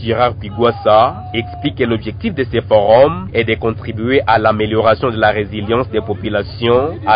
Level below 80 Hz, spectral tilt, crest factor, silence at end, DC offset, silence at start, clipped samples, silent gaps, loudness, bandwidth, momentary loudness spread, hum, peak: -34 dBFS; -12 dB/octave; 14 dB; 0 s; under 0.1%; 0 s; under 0.1%; none; -15 LUFS; 5.2 kHz; 9 LU; none; 0 dBFS